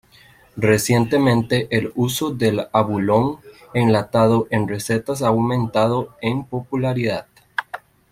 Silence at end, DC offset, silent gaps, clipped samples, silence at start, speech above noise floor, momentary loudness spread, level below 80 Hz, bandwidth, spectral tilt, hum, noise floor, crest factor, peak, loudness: 0.35 s; under 0.1%; none; under 0.1%; 0.55 s; 32 dB; 11 LU; -52 dBFS; 16.5 kHz; -6 dB/octave; none; -50 dBFS; 18 dB; -2 dBFS; -20 LUFS